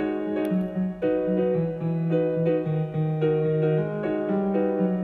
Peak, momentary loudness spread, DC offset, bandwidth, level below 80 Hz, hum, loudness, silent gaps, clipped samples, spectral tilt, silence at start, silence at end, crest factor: -12 dBFS; 4 LU; under 0.1%; 4.2 kHz; -56 dBFS; none; -25 LUFS; none; under 0.1%; -10.5 dB/octave; 0 s; 0 s; 12 dB